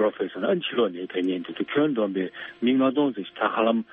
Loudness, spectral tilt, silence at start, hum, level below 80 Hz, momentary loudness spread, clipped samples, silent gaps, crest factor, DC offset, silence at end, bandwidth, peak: -25 LUFS; -3.5 dB/octave; 0 s; none; -72 dBFS; 6 LU; under 0.1%; none; 16 dB; under 0.1%; 0.1 s; 3.9 kHz; -10 dBFS